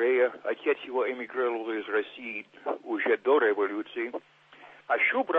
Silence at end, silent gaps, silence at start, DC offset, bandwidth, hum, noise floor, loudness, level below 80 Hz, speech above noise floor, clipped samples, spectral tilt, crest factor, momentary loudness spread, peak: 0 s; none; 0 s; under 0.1%; 4.4 kHz; none; -53 dBFS; -29 LUFS; -88 dBFS; 24 dB; under 0.1%; -5.5 dB/octave; 16 dB; 12 LU; -12 dBFS